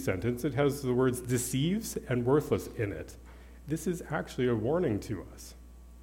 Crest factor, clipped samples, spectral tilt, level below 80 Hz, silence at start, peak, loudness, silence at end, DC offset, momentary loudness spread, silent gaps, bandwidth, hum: 16 dB; under 0.1%; -6 dB/octave; -50 dBFS; 0 s; -14 dBFS; -31 LUFS; 0 s; under 0.1%; 18 LU; none; 17.5 kHz; 60 Hz at -50 dBFS